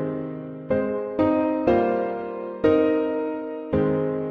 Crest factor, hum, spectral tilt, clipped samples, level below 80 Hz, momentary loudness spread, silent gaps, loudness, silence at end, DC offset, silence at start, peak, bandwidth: 16 dB; none; -9.5 dB/octave; under 0.1%; -50 dBFS; 11 LU; none; -24 LUFS; 0 s; under 0.1%; 0 s; -6 dBFS; 5.4 kHz